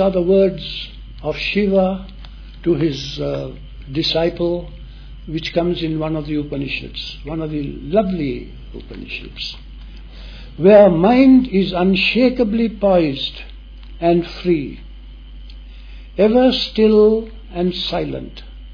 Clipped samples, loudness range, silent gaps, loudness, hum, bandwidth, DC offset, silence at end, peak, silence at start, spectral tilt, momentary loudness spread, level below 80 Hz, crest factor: under 0.1%; 10 LU; none; -17 LUFS; none; 5.4 kHz; under 0.1%; 0 s; 0 dBFS; 0 s; -7.5 dB/octave; 23 LU; -36 dBFS; 18 dB